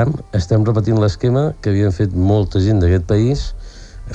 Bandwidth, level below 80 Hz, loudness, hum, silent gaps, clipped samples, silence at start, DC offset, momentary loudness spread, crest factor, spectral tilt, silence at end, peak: 8 kHz; -30 dBFS; -16 LUFS; none; none; under 0.1%; 0 s; under 0.1%; 7 LU; 12 dB; -8 dB/octave; 0 s; -4 dBFS